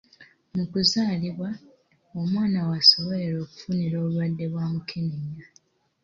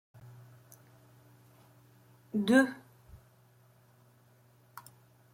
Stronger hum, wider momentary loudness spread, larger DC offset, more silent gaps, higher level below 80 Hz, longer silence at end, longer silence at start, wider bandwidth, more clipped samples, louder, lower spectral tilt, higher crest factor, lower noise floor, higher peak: neither; second, 18 LU vs 30 LU; neither; neither; first, -60 dBFS vs -72 dBFS; second, 0.6 s vs 2.6 s; second, 0.2 s vs 2.35 s; second, 7.6 kHz vs 16.5 kHz; neither; first, -24 LUFS vs -29 LUFS; about the same, -5.5 dB/octave vs -5.5 dB/octave; about the same, 22 dB vs 26 dB; second, -55 dBFS vs -63 dBFS; first, -4 dBFS vs -12 dBFS